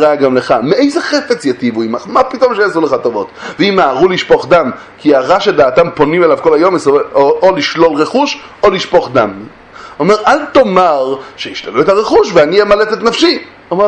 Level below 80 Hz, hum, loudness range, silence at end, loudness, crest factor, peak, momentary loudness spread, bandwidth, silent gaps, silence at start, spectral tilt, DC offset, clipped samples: -44 dBFS; none; 2 LU; 0 s; -10 LUFS; 10 dB; 0 dBFS; 8 LU; 9.8 kHz; none; 0 s; -5 dB/octave; under 0.1%; 0.4%